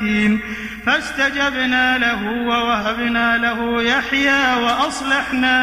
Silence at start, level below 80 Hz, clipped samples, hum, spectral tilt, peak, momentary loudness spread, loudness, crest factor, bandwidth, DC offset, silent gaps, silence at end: 0 s; -44 dBFS; under 0.1%; none; -3.5 dB/octave; -2 dBFS; 4 LU; -17 LUFS; 16 dB; 15.5 kHz; under 0.1%; none; 0 s